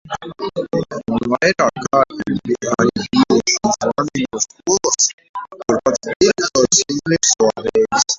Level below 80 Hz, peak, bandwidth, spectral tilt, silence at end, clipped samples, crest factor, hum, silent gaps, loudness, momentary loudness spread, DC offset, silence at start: -50 dBFS; 0 dBFS; 8 kHz; -3 dB/octave; 0 s; under 0.1%; 16 dB; none; 5.13-5.18 s, 5.29-5.34 s, 6.16-6.20 s; -17 LUFS; 9 LU; under 0.1%; 0.05 s